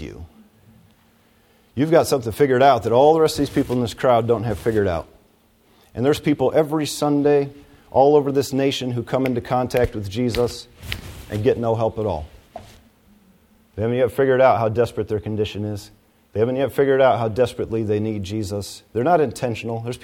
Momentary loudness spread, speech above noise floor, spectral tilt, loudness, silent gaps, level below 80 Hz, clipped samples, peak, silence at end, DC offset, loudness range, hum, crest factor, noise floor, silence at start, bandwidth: 14 LU; 38 dB; -6 dB/octave; -20 LUFS; none; -46 dBFS; under 0.1%; -2 dBFS; 0.05 s; under 0.1%; 5 LU; none; 18 dB; -57 dBFS; 0 s; 17 kHz